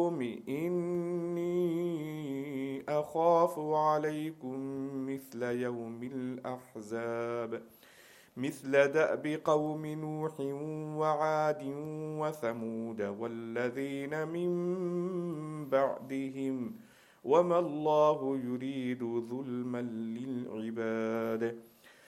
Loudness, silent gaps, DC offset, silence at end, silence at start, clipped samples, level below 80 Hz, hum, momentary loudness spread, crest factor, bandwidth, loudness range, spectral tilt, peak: -34 LUFS; none; under 0.1%; 0.15 s; 0 s; under 0.1%; -80 dBFS; none; 11 LU; 20 dB; 16 kHz; 5 LU; -7 dB/octave; -14 dBFS